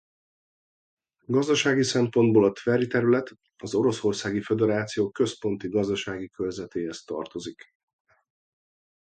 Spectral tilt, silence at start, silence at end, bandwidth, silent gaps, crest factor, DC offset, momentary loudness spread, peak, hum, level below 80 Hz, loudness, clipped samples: -5.5 dB/octave; 1.3 s; 1.6 s; 9.2 kHz; none; 18 dB; under 0.1%; 13 LU; -8 dBFS; none; -62 dBFS; -25 LUFS; under 0.1%